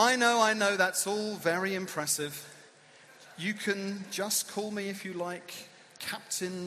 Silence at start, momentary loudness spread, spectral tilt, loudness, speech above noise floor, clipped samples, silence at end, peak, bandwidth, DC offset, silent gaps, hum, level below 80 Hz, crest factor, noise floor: 0 s; 17 LU; -2.5 dB/octave; -30 LUFS; 26 dB; under 0.1%; 0 s; -10 dBFS; 15.5 kHz; under 0.1%; none; none; -78 dBFS; 22 dB; -57 dBFS